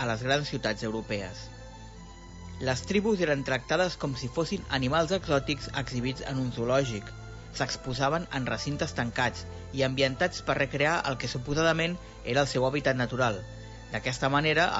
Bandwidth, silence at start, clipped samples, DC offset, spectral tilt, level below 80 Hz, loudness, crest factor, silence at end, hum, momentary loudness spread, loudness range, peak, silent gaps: 8 kHz; 0 s; under 0.1%; under 0.1%; -5 dB/octave; -48 dBFS; -29 LUFS; 20 dB; 0 s; none; 15 LU; 3 LU; -10 dBFS; none